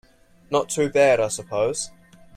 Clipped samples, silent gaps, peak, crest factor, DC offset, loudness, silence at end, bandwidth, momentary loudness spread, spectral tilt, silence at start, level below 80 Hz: under 0.1%; none; -6 dBFS; 18 dB; under 0.1%; -22 LUFS; 0.5 s; 15.5 kHz; 10 LU; -3.5 dB/octave; 0.5 s; -58 dBFS